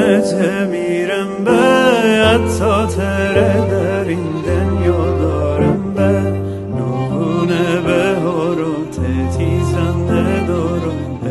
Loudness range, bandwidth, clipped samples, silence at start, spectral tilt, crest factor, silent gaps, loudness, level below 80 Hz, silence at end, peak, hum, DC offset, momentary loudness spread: 3 LU; 12 kHz; under 0.1%; 0 s; -6.5 dB/octave; 14 dB; none; -15 LUFS; -32 dBFS; 0 s; 0 dBFS; none; under 0.1%; 8 LU